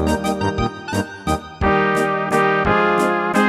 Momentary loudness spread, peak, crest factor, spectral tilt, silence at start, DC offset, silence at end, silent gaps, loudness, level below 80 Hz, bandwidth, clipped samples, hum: 8 LU; -2 dBFS; 16 dB; -5.5 dB/octave; 0 s; under 0.1%; 0 s; none; -18 LUFS; -34 dBFS; 15.5 kHz; under 0.1%; none